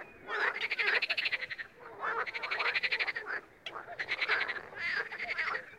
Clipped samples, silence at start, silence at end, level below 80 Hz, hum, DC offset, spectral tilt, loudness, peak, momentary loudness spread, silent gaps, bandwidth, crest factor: under 0.1%; 0 s; 0 s; -74 dBFS; none; under 0.1%; -1.5 dB/octave; -33 LUFS; -16 dBFS; 11 LU; none; 16 kHz; 20 dB